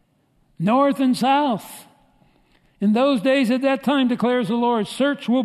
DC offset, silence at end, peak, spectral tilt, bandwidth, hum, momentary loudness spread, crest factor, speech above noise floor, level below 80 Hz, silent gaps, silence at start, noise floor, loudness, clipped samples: under 0.1%; 0 s; -6 dBFS; -6 dB/octave; 13.5 kHz; none; 6 LU; 14 dB; 44 dB; -66 dBFS; none; 0.6 s; -62 dBFS; -20 LUFS; under 0.1%